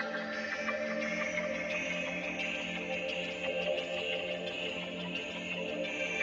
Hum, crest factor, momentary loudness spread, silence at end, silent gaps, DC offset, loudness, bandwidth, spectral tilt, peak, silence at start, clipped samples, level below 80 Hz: none; 16 dB; 3 LU; 0 s; none; under 0.1%; -35 LUFS; 8.2 kHz; -3.5 dB/octave; -20 dBFS; 0 s; under 0.1%; -66 dBFS